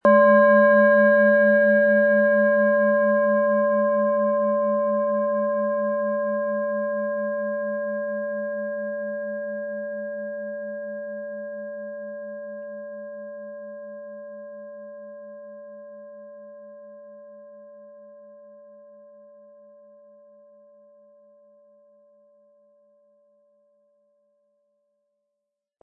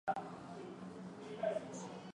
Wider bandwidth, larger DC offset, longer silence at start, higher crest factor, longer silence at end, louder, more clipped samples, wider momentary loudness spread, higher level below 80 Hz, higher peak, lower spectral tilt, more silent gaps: second, 4.1 kHz vs 11 kHz; neither; about the same, 0.05 s vs 0.05 s; about the same, 18 dB vs 20 dB; first, 7.75 s vs 0.05 s; first, -21 LUFS vs -45 LUFS; neither; first, 25 LU vs 10 LU; about the same, -82 dBFS vs -78 dBFS; first, -6 dBFS vs -24 dBFS; first, -10 dB/octave vs -5.5 dB/octave; neither